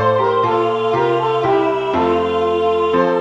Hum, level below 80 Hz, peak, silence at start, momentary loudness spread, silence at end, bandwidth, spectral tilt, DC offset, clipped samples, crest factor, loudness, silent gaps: none; -50 dBFS; -2 dBFS; 0 s; 2 LU; 0 s; 7.8 kHz; -7 dB/octave; under 0.1%; under 0.1%; 14 dB; -16 LUFS; none